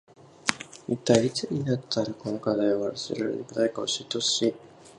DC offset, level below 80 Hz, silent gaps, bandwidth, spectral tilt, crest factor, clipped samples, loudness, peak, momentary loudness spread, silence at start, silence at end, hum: under 0.1%; -64 dBFS; none; 11.5 kHz; -4 dB/octave; 28 dB; under 0.1%; -27 LUFS; 0 dBFS; 8 LU; 0.45 s; 0.1 s; none